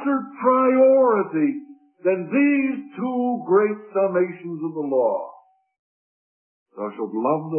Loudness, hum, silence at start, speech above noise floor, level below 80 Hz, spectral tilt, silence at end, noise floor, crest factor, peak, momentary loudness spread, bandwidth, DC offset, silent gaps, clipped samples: -21 LUFS; none; 0 s; over 68 dB; -80 dBFS; -12 dB/octave; 0 s; under -90 dBFS; 16 dB; -6 dBFS; 14 LU; 3.3 kHz; under 0.1%; 5.79-6.66 s; under 0.1%